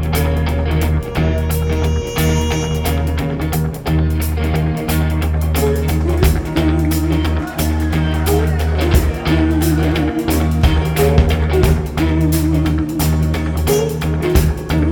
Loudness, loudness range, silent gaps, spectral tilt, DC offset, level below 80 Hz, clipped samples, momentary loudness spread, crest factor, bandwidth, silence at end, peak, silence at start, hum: -16 LUFS; 3 LU; none; -6.5 dB/octave; under 0.1%; -20 dBFS; under 0.1%; 3 LU; 14 dB; 19.5 kHz; 0 s; 0 dBFS; 0 s; none